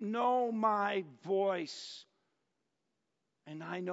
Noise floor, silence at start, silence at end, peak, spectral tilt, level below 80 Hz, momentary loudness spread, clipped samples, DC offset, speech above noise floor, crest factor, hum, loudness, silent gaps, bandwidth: -85 dBFS; 0 s; 0 s; -18 dBFS; -3.5 dB/octave; under -90 dBFS; 16 LU; under 0.1%; under 0.1%; 51 dB; 18 dB; none; -34 LUFS; none; 7.6 kHz